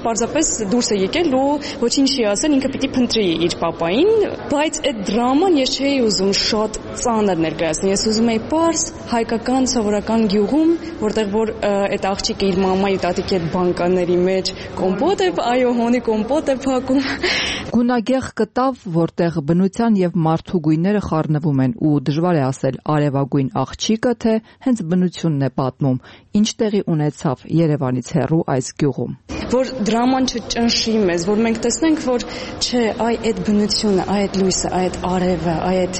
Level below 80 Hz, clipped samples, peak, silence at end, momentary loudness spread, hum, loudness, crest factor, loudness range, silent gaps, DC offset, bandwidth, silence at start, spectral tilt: -42 dBFS; under 0.1%; -6 dBFS; 0 s; 5 LU; none; -18 LUFS; 12 dB; 2 LU; none; under 0.1%; 8.8 kHz; 0 s; -5 dB/octave